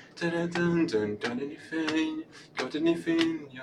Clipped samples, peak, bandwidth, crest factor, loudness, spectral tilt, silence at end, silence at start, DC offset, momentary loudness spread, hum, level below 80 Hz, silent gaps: under 0.1%; -8 dBFS; 10.5 kHz; 20 dB; -30 LUFS; -6 dB/octave; 0 s; 0 s; under 0.1%; 9 LU; none; -66 dBFS; none